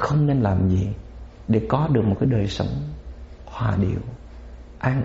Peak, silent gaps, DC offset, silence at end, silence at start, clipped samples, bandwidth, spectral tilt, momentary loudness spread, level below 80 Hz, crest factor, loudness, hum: -6 dBFS; none; under 0.1%; 0 s; 0 s; under 0.1%; 7.8 kHz; -7.5 dB/octave; 22 LU; -38 dBFS; 16 dB; -22 LUFS; none